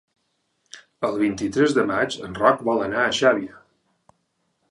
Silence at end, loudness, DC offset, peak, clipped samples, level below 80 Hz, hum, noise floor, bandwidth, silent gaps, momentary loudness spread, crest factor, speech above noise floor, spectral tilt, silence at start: 1.2 s; -21 LUFS; under 0.1%; -2 dBFS; under 0.1%; -58 dBFS; none; -72 dBFS; 11.5 kHz; none; 8 LU; 22 dB; 51 dB; -4.5 dB/octave; 0.75 s